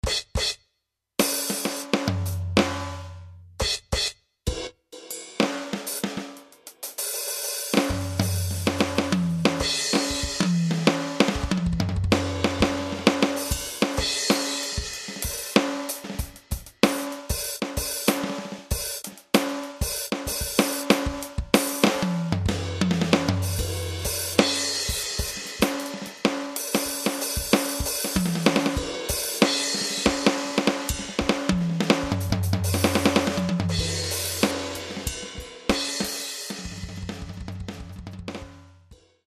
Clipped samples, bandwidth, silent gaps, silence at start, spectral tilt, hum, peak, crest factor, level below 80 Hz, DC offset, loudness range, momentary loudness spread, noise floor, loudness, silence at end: under 0.1%; 14 kHz; none; 0.05 s; -4 dB/octave; none; 0 dBFS; 26 dB; -40 dBFS; under 0.1%; 5 LU; 13 LU; -78 dBFS; -25 LUFS; 0.35 s